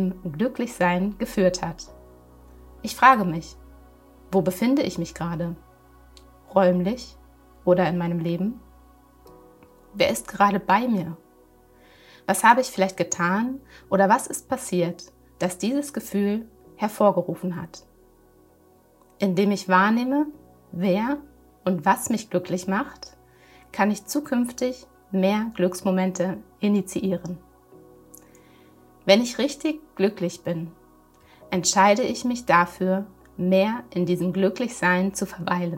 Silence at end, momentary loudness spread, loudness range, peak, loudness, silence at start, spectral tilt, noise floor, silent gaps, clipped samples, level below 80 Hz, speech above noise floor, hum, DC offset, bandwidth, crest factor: 0 s; 14 LU; 4 LU; -2 dBFS; -23 LUFS; 0 s; -5 dB/octave; -57 dBFS; none; under 0.1%; -54 dBFS; 34 dB; none; under 0.1%; 16 kHz; 22 dB